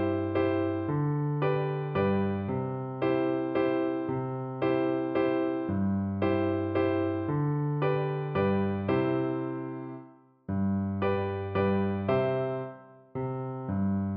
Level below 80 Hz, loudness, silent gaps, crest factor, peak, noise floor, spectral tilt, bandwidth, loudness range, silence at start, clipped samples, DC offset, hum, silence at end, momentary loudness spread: -64 dBFS; -29 LUFS; none; 16 dB; -14 dBFS; -52 dBFS; -11.5 dB/octave; 5.2 kHz; 2 LU; 0 s; under 0.1%; under 0.1%; none; 0 s; 7 LU